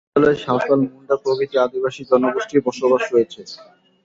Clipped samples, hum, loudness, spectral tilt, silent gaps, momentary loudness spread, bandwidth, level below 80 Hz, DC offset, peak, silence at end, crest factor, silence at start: under 0.1%; none; -19 LUFS; -6 dB/octave; none; 9 LU; 7.8 kHz; -58 dBFS; under 0.1%; -2 dBFS; 0.4 s; 16 dB; 0.15 s